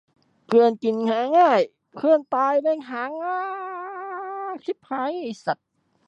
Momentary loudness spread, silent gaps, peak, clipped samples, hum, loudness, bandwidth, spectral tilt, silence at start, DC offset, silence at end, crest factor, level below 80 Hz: 14 LU; none; -6 dBFS; under 0.1%; none; -23 LUFS; 8 kHz; -6 dB/octave; 0.5 s; under 0.1%; 0.55 s; 16 dB; -80 dBFS